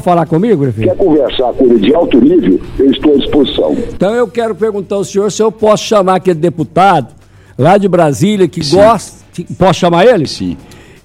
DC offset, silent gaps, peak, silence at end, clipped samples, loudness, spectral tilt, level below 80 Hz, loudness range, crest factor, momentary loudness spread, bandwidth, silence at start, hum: under 0.1%; none; 0 dBFS; 0.3 s; 0.5%; -10 LUFS; -6 dB/octave; -34 dBFS; 2 LU; 10 dB; 8 LU; 14.5 kHz; 0 s; none